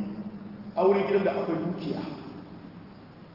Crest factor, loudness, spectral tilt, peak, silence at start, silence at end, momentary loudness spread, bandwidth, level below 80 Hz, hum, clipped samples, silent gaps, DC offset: 18 dB; -28 LUFS; -9 dB/octave; -12 dBFS; 0 s; 0 s; 22 LU; 5.8 kHz; -64 dBFS; none; under 0.1%; none; under 0.1%